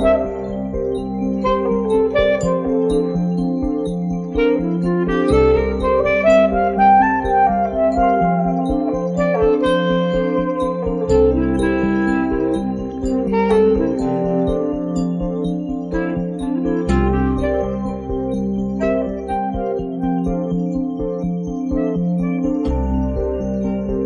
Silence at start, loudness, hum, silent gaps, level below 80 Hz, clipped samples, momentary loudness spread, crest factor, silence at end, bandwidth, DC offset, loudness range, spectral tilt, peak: 0 s; -18 LUFS; none; none; -30 dBFS; under 0.1%; 8 LU; 14 dB; 0 s; 10 kHz; under 0.1%; 6 LU; -8 dB/octave; -4 dBFS